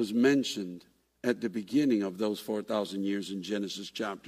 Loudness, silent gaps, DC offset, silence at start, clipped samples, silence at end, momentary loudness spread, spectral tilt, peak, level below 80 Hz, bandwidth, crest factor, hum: -31 LUFS; none; under 0.1%; 0 s; under 0.1%; 0 s; 10 LU; -5 dB/octave; -14 dBFS; -74 dBFS; 15.5 kHz; 18 dB; none